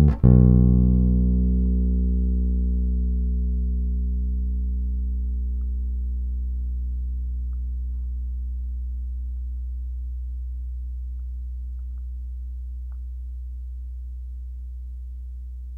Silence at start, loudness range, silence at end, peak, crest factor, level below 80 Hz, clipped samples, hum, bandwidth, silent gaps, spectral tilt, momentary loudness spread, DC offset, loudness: 0 s; 13 LU; 0 s; -6 dBFS; 18 dB; -24 dBFS; under 0.1%; none; 1.5 kHz; none; -13 dB/octave; 17 LU; under 0.1%; -25 LUFS